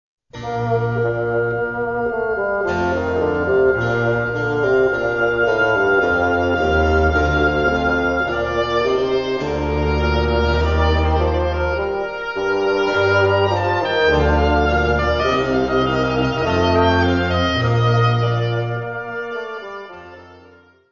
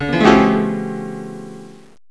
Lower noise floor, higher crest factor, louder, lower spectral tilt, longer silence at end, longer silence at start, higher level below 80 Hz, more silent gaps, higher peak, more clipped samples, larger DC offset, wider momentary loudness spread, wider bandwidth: first, -48 dBFS vs -37 dBFS; about the same, 16 dB vs 18 dB; second, -18 LUFS vs -15 LUFS; about the same, -7 dB/octave vs -6.5 dB/octave; first, 0.55 s vs 0.4 s; first, 0.35 s vs 0 s; first, -28 dBFS vs -42 dBFS; neither; about the same, -2 dBFS vs 0 dBFS; neither; about the same, 0.3% vs 0.6%; second, 7 LU vs 21 LU; second, 7.2 kHz vs 11 kHz